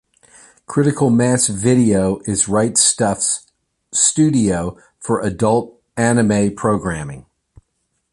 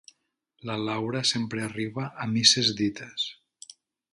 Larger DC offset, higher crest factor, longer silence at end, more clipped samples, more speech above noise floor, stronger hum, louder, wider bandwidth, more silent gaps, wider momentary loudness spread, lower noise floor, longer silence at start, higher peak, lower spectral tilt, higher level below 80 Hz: neither; second, 18 dB vs 26 dB; about the same, 0.9 s vs 0.8 s; neither; first, 54 dB vs 46 dB; neither; first, -16 LUFS vs -26 LUFS; about the same, 11.5 kHz vs 11.5 kHz; neither; second, 11 LU vs 14 LU; about the same, -70 dBFS vs -73 dBFS; about the same, 0.7 s vs 0.65 s; about the same, 0 dBFS vs -2 dBFS; first, -4.5 dB/octave vs -3 dB/octave; first, -44 dBFS vs -66 dBFS